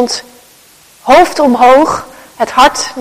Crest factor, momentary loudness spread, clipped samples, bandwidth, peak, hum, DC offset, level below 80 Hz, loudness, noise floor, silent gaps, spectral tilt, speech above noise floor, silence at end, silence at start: 10 dB; 14 LU; 2%; 16 kHz; 0 dBFS; none; under 0.1%; -40 dBFS; -9 LUFS; -42 dBFS; none; -2.5 dB/octave; 34 dB; 0 s; 0 s